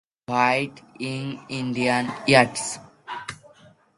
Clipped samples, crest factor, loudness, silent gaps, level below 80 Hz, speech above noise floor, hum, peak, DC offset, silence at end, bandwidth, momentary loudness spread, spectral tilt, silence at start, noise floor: under 0.1%; 24 dB; -23 LUFS; none; -62 dBFS; 31 dB; none; 0 dBFS; under 0.1%; 0.65 s; 11.5 kHz; 17 LU; -4 dB/octave; 0.3 s; -54 dBFS